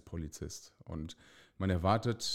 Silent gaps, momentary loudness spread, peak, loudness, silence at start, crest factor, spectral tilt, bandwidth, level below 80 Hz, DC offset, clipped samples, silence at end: none; 17 LU; -16 dBFS; -36 LUFS; 0.05 s; 20 dB; -5 dB/octave; 15.5 kHz; -52 dBFS; under 0.1%; under 0.1%; 0 s